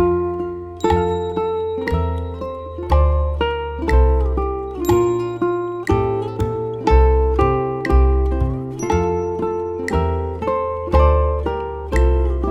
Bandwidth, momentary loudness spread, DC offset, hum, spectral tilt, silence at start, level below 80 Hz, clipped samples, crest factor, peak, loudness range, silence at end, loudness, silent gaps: 12.5 kHz; 8 LU; under 0.1%; none; -8 dB/octave; 0 s; -22 dBFS; under 0.1%; 16 dB; -2 dBFS; 2 LU; 0 s; -19 LUFS; none